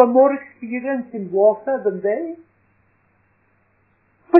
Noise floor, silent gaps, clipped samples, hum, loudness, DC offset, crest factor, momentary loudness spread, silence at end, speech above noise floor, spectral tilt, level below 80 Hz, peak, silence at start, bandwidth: -62 dBFS; none; under 0.1%; none; -20 LUFS; under 0.1%; 20 dB; 13 LU; 0 s; 43 dB; -10.5 dB/octave; -74 dBFS; 0 dBFS; 0 s; 2.9 kHz